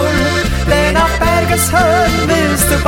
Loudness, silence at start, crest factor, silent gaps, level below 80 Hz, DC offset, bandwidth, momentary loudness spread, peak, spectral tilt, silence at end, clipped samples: -12 LUFS; 0 s; 10 dB; none; -20 dBFS; under 0.1%; 17 kHz; 3 LU; -2 dBFS; -4 dB/octave; 0 s; under 0.1%